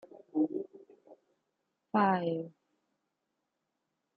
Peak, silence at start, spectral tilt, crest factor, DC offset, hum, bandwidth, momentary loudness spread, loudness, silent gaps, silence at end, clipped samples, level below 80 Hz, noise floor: -14 dBFS; 0.15 s; -9.5 dB/octave; 22 dB; under 0.1%; none; 4.7 kHz; 16 LU; -33 LUFS; none; 1.7 s; under 0.1%; -86 dBFS; -84 dBFS